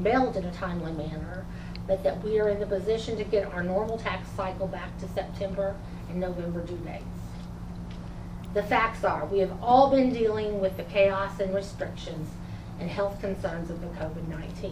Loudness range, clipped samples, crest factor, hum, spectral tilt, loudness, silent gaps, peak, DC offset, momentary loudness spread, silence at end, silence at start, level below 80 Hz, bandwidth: 9 LU; under 0.1%; 20 dB; none; -7 dB/octave; -29 LUFS; none; -8 dBFS; under 0.1%; 15 LU; 0 s; 0 s; -44 dBFS; 15.5 kHz